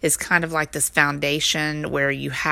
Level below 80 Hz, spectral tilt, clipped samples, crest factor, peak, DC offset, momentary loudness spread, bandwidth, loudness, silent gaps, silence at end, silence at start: -50 dBFS; -2.5 dB/octave; under 0.1%; 22 dB; 0 dBFS; under 0.1%; 5 LU; 16.5 kHz; -20 LUFS; none; 0 s; 0.05 s